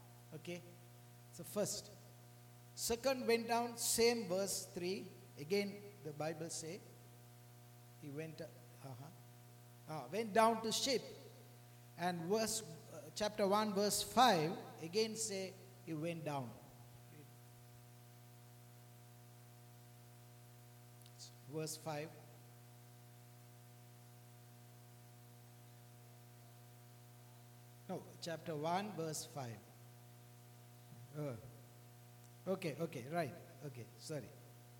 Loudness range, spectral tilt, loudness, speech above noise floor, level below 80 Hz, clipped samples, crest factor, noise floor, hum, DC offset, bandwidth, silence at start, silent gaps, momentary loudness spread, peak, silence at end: 23 LU; -3.5 dB/octave; -40 LUFS; 20 dB; -78 dBFS; under 0.1%; 26 dB; -60 dBFS; 60 Hz at -60 dBFS; under 0.1%; 19 kHz; 0 s; none; 24 LU; -18 dBFS; 0 s